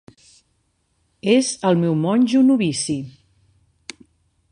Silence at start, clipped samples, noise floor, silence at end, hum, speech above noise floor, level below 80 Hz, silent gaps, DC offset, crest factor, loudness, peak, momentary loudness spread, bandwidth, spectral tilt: 1.25 s; under 0.1%; -67 dBFS; 1.4 s; none; 50 dB; -62 dBFS; none; under 0.1%; 18 dB; -18 LUFS; -2 dBFS; 23 LU; 11 kHz; -5.5 dB/octave